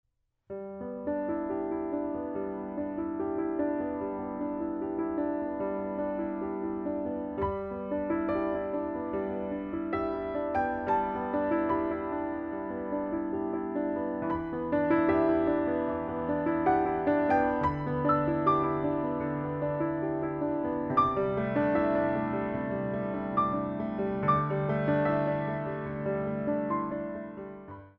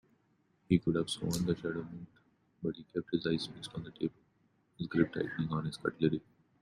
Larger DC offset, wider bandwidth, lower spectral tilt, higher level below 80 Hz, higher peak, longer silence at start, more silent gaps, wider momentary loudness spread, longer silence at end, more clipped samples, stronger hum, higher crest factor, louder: neither; second, 5.2 kHz vs 13.5 kHz; first, -10 dB/octave vs -6 dB/octave; first, -54 dBFS vs -64 dBFS; about the same, -12 dBFS vs -14 dBFS; second, 0.5 s vs 0.7 s; neither; second, 8 LU vs 12 LU; second, 0.1 s vs 0.4 s; neither; neither; about the same, 18 dB vs 22 dB; first, -31 LUFS vs -35 LUFS